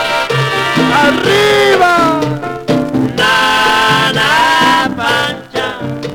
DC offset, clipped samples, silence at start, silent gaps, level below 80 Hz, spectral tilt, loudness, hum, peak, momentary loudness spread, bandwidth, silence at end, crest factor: under 0.1%; under 0.1%; 0 s; none; -42 dBFS; -4 dB/octave; -11 LUFS; none; 0 dBFS; 9 LU; over 20 kHz; 0 s; 12 dB